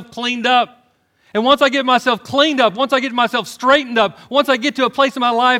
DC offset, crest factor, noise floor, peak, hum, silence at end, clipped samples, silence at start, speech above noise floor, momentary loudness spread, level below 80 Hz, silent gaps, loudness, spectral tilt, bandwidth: under 0.1%; 14 dB; -57 dBFS; 0 dBFS; none; 0 s; under 0.1%; 0 s; 42 dB; 5 LU; -60 dBFS; none; -15 LUFS; -3.5 dB/octave; 16 kHz